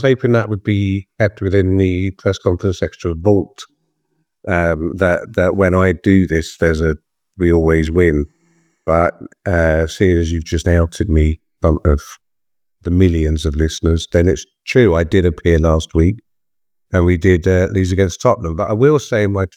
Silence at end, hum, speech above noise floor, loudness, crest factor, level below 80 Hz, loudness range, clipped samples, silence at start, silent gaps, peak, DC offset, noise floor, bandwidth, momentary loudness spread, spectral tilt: 0.1 s; none; 70 dB; -15 LUFS; 16 dB; -30 dBFS; 3 LU; under 0.1%; 0 s; none; 0 dBFS; under 0.1%; -84 dBFS; 10.5 kHz; 7 LU; -7 dB/octave